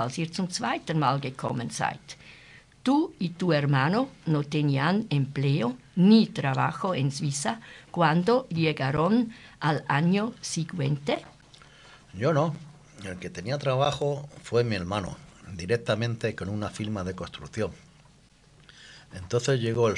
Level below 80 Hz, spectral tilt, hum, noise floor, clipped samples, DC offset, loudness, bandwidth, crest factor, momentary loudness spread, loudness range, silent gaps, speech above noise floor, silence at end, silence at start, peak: -60 dBFS; -6 dB/octave; none; -57 dBFS; under 0.1%; under 0.1%; -27 LUFS; 11.5 kHz; 20 dB; 13 LU; 7 LU; none; 31 dB; 0 s; 0 s; -8 dBFS